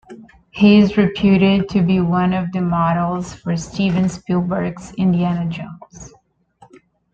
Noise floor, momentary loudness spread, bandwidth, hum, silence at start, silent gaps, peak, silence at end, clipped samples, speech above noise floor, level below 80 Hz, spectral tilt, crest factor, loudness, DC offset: -51 dBFS; 13 LU; 8 kHz; none; 0.1 s; none; -2 dBFS; 1.05 s; under 0.1%; 35 dB; -44 dBFS; -7 dB/octave; 16 dB; -17 LUFS; under 0.1%